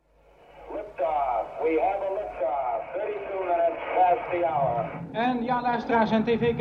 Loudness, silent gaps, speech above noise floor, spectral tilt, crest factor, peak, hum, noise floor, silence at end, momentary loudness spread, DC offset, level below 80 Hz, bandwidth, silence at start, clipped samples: -26 LUFS; none; 32 dB; -8 dB/octave; 16 dB; -10 dBFS; none; -56 dBFS; 0 s; 8 LU; under 0.1%; -56 dBFS; 6.6 kHz; 0.55 s; under 0.1%